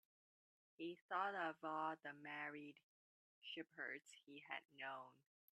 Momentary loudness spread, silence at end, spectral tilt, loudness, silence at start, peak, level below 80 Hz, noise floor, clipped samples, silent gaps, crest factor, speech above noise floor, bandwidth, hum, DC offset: 15 LU; 0.45 s; -4 dB/octave; -50 LUFS; 0.8 s; -30 dBFS; under -90 dBFS; under -90 dBFS; under 0.1%; 1.02-1.09 s, 2.83-3.42 s, 4.65-4.69 s; 22 dB; over 39 dB; 11.5 kHz; none; under 0.1%